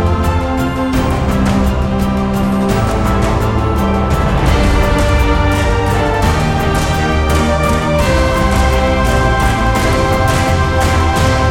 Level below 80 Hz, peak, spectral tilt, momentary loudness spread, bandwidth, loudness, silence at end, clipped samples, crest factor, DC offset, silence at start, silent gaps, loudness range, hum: -18 dBFS; 0 dBFS; -6 dB/octave; 2 LU; 17 kHz; -13 LUFS; 0 s; under 0.1%; 12 dB; under 0.1%; 0 s; none; 2 LU; none